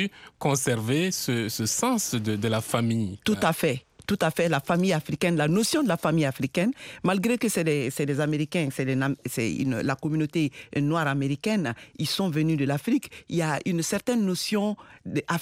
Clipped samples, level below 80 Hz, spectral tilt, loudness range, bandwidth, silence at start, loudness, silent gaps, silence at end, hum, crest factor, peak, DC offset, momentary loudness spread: under 0.1%; -62 dBFS; -5 dB/octave; 2 LU; 16 kHz; 0 s; -26 LUFS; none; 0 s; none; 16 dB; -8 dBFS; under 0.1%; 5 LU